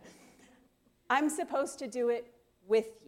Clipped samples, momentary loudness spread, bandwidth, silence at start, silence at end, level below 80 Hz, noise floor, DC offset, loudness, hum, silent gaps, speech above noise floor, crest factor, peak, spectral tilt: under 0.1%; 6 LU; 16 kHz; 0.05 s; 0.15 s; -76 dBFS; -68 dBFS; under 0.1%; -32 LUFS; none; none; 37 dB; 20 dB; -14 dBFS; -3 dB/octave